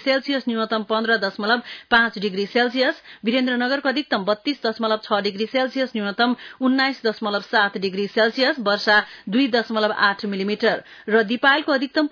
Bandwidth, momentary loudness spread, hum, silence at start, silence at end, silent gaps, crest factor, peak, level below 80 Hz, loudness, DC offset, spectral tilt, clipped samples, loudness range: 5.4 kHz; 6 LU; none; 0 s; 0.05 s; none; 16 dB; -4 dBFS; -66 dBFS; -21 LUFS; under 0.1%; -5.5 dB/octave; under 0.1%; 2 LU